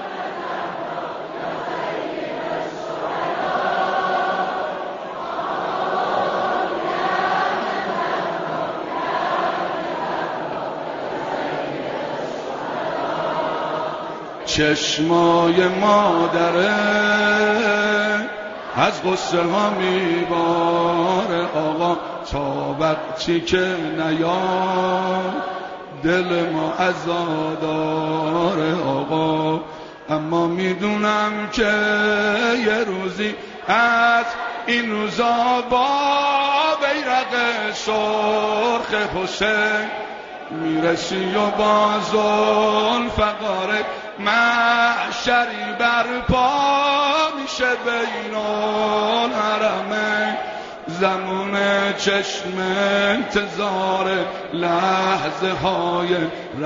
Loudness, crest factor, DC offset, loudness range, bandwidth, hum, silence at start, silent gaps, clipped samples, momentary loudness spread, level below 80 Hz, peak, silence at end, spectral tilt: -20 LUFS; 18 dB; under 0.1%; 6 LU; 7.4 kHz; none; 0 s; none; under 0.1%; 10 LU; -48 dBFS; -4 dBFS; 0 s; -2.5 dB/octave